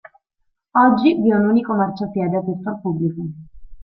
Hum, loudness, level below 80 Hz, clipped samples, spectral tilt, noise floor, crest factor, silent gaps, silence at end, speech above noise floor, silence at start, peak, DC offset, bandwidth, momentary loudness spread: none; -18 LUFS; -52 dBFS; under 0.1%; -10.5 dB/octave; -70 dBFS; 18 dB; none; 0 s; 52 dB; 0.75 s; -2 dBFS; under 0.1%; 5.6 kHz; 11 LU